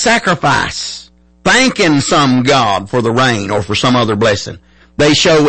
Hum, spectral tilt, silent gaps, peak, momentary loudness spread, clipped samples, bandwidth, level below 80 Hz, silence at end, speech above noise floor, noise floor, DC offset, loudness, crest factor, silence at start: none; -4 dB/octave; none; -2 dBFS; 10 LU; under 0.1%; 8.8 kHz; -40 dBFS; 0 s; 26 dB; -37 dBFS; under 0.1%; -12 LUFS; 12 dB; 0 s